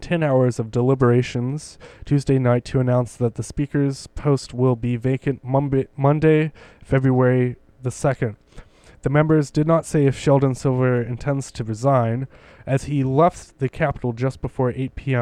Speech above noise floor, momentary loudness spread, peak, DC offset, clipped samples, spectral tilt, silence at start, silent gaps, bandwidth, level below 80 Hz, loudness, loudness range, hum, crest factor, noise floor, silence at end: 24 dB; 10 LU; -2 dBFS; under 0.1%; under 0.1%; -7.5 dB/octave; 0 s; none; 11 kHz; -44 dBFS; -21 LUFS; 2 LU; none; 18 dB; -44 dBFS; 0 s